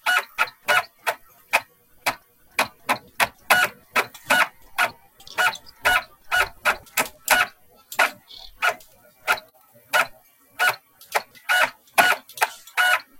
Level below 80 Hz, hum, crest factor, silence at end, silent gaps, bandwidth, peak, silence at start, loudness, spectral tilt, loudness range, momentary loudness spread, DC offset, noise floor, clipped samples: -58 dBFS; none; 24 dB; 0.2 s; none; 17 kHz; 0 dBFS; 0.05 s; -22 LUFS; 0 dB/octave; 3 LU; 9 LU; under 0.1%; -54 dBFS; under 0.1%